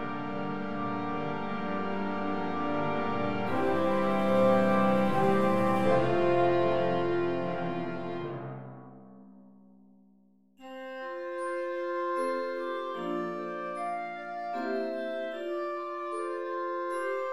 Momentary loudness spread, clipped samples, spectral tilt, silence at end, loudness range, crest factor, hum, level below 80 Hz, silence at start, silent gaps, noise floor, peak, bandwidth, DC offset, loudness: 12 LU; under 0.1%; -7.5 dB/octave; 0 s; 13 LU; 18 dB; none; -64 dBFS; 0 s; none; -63 dBFS; -12 dBFS; 13 kHz; under 0.1%; -30 LUFS